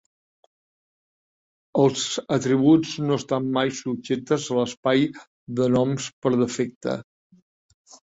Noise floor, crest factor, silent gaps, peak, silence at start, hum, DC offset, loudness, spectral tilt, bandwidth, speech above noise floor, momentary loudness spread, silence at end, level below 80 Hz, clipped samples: under -90 dBFS; 18 dB; 4.77-4.83 s, 5.27-5.47 s, 6.13-6.22 s, 6.76-6.81 s; -6 dBFS; 1.75 s; none; under 0.1%; -23 LUFS; -5.5 dB/octave; 8 kHz; over 68 dB; 10 LU; 1.1 s; -62 dBFS; under 0.1%